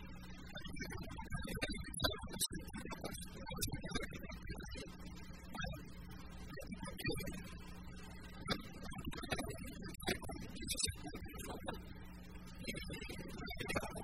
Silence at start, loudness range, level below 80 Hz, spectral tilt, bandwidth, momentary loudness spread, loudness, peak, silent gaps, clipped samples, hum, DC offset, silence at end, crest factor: 0 s; 5 LU; -54 dBFS; -3.5 dB/octave; 16 kHz; 13 LU; -45 LUFS; -20 dBFS; none; under 0.1%; none; 0.1%; 0 s; 26 dB